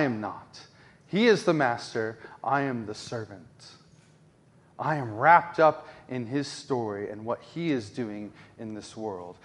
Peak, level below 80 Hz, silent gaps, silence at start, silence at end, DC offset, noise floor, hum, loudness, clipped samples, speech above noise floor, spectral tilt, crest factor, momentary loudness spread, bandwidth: -4 dBFS; -70 dBFS; none; 0 s; 0.1 s; under 0.1%; -59 dBFS; none; -27 LUFS; under 0.1%; 31 dB; -5.5 dB/octave; 24 dB; 20 LU; 11.5 kHz